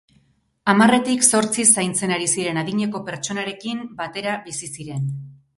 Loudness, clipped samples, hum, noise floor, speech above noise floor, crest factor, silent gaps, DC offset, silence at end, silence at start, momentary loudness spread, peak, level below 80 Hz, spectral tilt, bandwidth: -20 LUFS; under 0.1%; none; -61 dBFS; 41 dB; 22 dB; none; under 0.1%; 0.25 s; 0.65 s; 14 LU; 0 dBFS; -62 dBFS; -3 dB/octave; 11.5 kHz